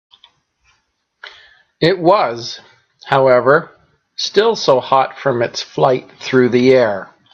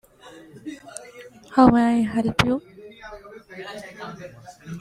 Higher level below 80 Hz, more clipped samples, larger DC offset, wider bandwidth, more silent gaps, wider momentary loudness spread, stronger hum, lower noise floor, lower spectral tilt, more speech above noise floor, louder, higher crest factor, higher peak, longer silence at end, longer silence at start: second, -60 dBFS vs -48 dBFS; neither; neither; second, 7.6 kHz vs 12.5 kHz; neither; second, 11 LU vs 26 LU; neither; first, -65 dBFS vs -47 dBFS; about the same, -5 dB/octave vs -6 dB/octave; first, 51 dB vs 26 dB; first, -14 LUFS vs -19 LUFS; second, 16 dB vs 22 dB; about the same, 0 dBFS vs -2 dBFS; first, 0.3 s vs 0 s; first, 1.25 s vs 0.25 s